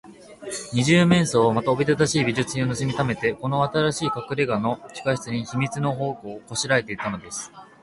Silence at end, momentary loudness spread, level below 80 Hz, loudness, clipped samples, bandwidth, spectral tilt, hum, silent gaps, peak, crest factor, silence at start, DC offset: 0.15 s; 13 LU; -54 dBFS; -23 LUFS; under 0.1%; 11.5 kHz; -5 dB/octave; none; none; -4 dBFS; 20 dB; 0.05 s; under 0.1%